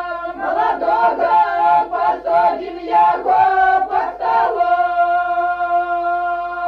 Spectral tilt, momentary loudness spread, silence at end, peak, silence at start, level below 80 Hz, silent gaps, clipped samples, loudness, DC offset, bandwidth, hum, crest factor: -5.5 dB/octave; 6 LU; 0 s; -4 dBFS; 0 s; -52 dBFS; none; under 0.1%; -16 LUFS; under 0.1%; 5.6 kHz; 50 Hz at -50 dBFS; 12 dB